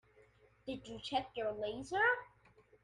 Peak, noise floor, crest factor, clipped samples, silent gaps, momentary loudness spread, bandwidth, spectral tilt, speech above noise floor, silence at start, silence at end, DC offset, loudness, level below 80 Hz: -22 dBFS; -67 dBFS; 18 dB; under 0.1%; none; 14 LU; 11.5 kHz; -4 dB/octave; 29 dB; 0.65 s; 0.55 s; under 0.1%; -38 LUFS; -68 dBFS